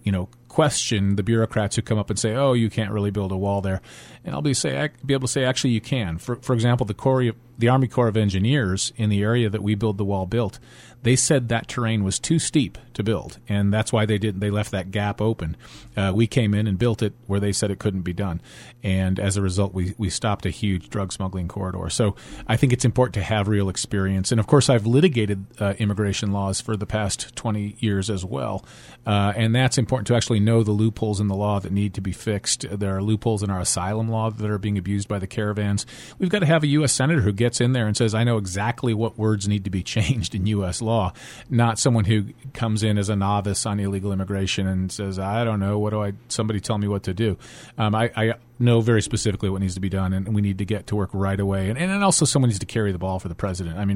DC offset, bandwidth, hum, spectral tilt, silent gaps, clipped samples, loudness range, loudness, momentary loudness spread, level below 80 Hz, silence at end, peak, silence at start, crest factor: under 0.1%; 12 kHz; none; -5.5 dB/octave; none; under 0.1%; 4 LU; -23 LUFS; 8 LU; -46 dBFS; 0 s; -4 dBFS; 0.05 s; 18 dB